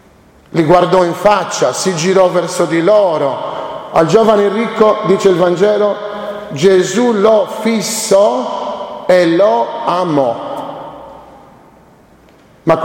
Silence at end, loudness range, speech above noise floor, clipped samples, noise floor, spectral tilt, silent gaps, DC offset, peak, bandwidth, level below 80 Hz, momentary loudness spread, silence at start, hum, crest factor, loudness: 0 s; 3 LU; 33 dB; under 0.1%; -44 dBFS; -5 dB/octave; none; under 0.1%; 0 dBFS; 16.5 kHz; -50 dBFS; 12 LU; 0.55 s; none; 12 dB; -12 LUFS